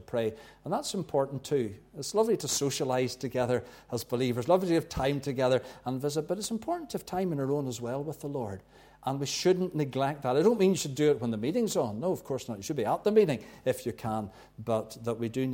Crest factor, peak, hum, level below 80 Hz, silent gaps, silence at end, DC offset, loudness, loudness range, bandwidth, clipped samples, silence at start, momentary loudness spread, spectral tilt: 18 dB; -12 dBFS; none; -60 dBFS; none; 0 s; under 0.1%; -30 LUFS; 4 LU; 17 kHz; under 0.1%; 0 s; 10 LU; -5 dB/octave